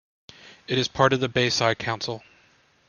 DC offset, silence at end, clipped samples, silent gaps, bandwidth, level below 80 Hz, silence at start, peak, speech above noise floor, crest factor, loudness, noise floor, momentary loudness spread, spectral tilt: under 0.1%; 0.7 s; under 0.1%; none; 10 kHz; -58 dBFS; 0.45 s; -2 dBFS; 37 dB; 24 dB; -23 LUFS; -60 dBFS; 13 LU; -4 dB/octave